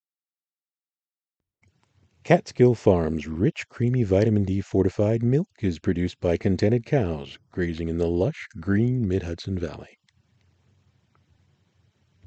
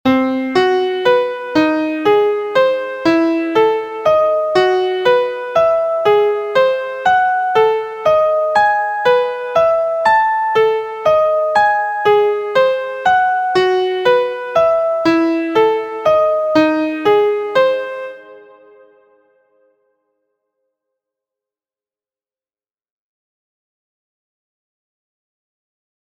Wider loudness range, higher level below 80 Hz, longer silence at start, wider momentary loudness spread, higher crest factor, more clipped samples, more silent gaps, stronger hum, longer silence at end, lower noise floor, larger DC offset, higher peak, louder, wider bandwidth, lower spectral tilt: first, 7 LU vs 2 LU; first, -48 dBFS vs -56 dBFS; first, 2.25 s vs 0.05 s; first, 9 LU vs 3 LU; first, 24 dB vs 14 dB; neither; neither; neither; second, 2.4 s vs 7.7 s; about the same, under -90 dBFS vs under -90 dBFS; neither; about the same, -2 dBFS vs 0 dBFS; second, -24 LUFS vs -14 LUFS; second, 8.2 kHz vs 17.5 kHz; first, -8 dB/octave vs -5 dB/octave